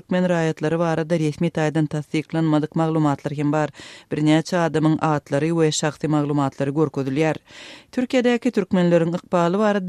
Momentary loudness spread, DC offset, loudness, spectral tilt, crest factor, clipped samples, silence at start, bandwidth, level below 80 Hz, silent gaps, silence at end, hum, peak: 6 LU; under 0.1%; -21 LUFS; -6.5 dB/octave; 16 dB; under 0.1%; 0.1 s; 11.5 kHz; -60 dBFS; none; 0 s; none; -4 dBFS